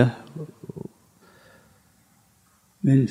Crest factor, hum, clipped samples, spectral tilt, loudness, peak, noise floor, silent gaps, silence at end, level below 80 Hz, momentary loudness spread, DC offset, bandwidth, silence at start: 24 dB; none; under 0.1%; -9 dB/octave; -26 LUFS; -4 dBFS; -61 dBFS; none; 0 s; -66 dBFS; 20 LU; under 0.1%; 10 kHz; 0 s